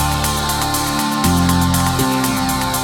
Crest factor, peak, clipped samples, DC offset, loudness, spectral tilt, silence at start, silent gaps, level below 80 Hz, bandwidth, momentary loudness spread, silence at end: 14 dB; -2 dBFS; under 0.1%; under 0.1%; -16 LUFS; -4 dB/octave; 0 s; none; -30 dBFS; 20 kHz; 3 LU; 0 s